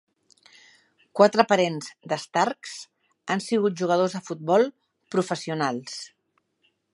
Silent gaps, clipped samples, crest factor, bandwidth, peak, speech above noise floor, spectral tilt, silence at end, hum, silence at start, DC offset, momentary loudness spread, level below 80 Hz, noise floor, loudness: none; under 0.1%; 24 dB; 11.5 kHz; -2 dBFS; 48 dB; -5 dB/octave; 0.85 s; none; 1.15 s; under 0.1%; 17 LU; -78 dBFS; -71 dBFS; -24 LUFS